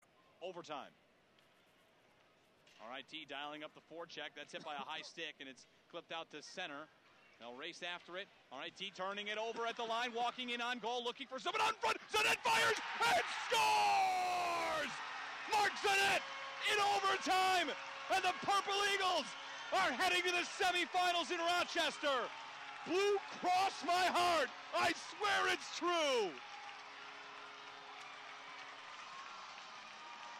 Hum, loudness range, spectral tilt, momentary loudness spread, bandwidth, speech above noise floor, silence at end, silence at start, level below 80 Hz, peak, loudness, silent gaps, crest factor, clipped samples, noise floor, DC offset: none; 15 LU; -1.5 dB/octave; 18 LU; 16 kHz; 33 dB; 0 s; 0.4 s; -78 dBFS; -28 dBFS; -37 LUFS; none; 12 dB; under 0.1%; -70 dBFS; under 0.1%